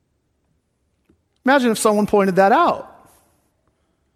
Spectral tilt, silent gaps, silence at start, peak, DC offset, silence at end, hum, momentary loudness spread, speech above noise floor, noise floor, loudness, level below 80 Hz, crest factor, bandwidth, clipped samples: -5 dB/octave; none; 1.45 s; -2 dBFS; under 0.1%; 1.3 s; none; 7 LU; 52 dB; -68 dBFS; -17 LUFS; -58 dBFS; 18 dB; 14 kHz; under 0.1%